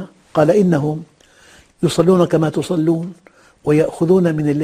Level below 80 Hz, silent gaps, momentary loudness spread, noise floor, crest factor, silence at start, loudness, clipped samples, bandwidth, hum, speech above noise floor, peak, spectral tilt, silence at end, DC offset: -50 dBFS; none; 9 LU; -48 dBFS; 16 dB; 0 s; -16 LUFS; under 0.1%; 14.5 kHz; none; 33 dB; 0 dBFS; -7.5 dB/octave; 0 s; under 0.1%